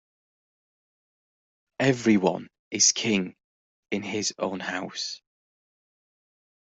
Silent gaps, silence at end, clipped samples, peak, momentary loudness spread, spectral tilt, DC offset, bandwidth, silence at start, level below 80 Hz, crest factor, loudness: 2.59-2.71 s, 3.44-3.83 s; 1.45 s; under 0.1%; -6 dBFS; 15 LU; -3 dB/octave; under 0.1%; 8.2 kHz; 1.8 s; -68 dBFS; 22 dB; -25 LUFS